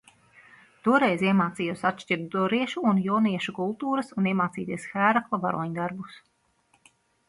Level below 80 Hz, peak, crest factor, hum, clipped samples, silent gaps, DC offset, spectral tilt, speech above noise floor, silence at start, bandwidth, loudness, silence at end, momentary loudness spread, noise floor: -68 dBFS; -10 dBFS; 18 dB; none; under 0.1%; none; under 0.1%; -6.5 dB/octave; 41 dB; 0.85 s; 11.5 kHz; -26 LUFS; 1.1 s; 9 LU; -67 dBFS